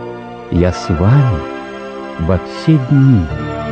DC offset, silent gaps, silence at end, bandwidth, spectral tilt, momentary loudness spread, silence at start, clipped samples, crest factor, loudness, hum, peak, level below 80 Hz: under 0.1%; none; 0 s; 8.4 kHz; -8.5 dB/octave; 16 LU; 0 s; under 0.1%; 14 dB; -14 LUFS; none; 0 dBFS; -30 dBFS